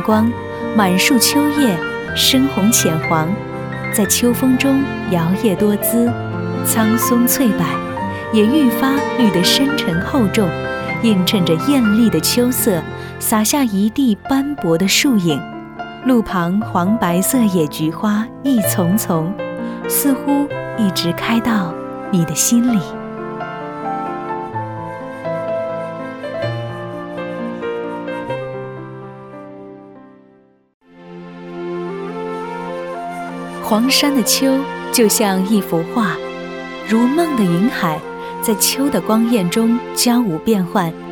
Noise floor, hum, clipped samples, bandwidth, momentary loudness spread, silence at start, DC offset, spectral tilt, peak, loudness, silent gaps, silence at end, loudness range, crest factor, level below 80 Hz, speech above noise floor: -50 dBFS; none; under 0.1%; over 20 kHz; 14 LU; 0 s; under 0.1%; -4 dB/octave; 0 dBFS; -16 LUFS; 30.74-30.80 s; 0 s; 12 LU; 16 dB; -46 dBFS; 36 dB